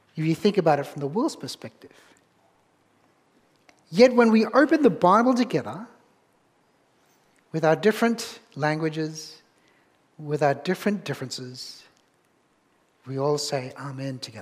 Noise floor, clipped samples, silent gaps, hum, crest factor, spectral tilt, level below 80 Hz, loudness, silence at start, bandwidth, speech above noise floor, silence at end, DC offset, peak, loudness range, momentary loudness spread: -65 dBFS; under 0.1%; none; none; 22 dB; -5.5 dB/octave; -72 dBFS; -23 LUFS; 0.15 s; 15.5 kHz; 42 dB; 0 s; under 0.1%; -2 dBFS; 9 LU; 19 LU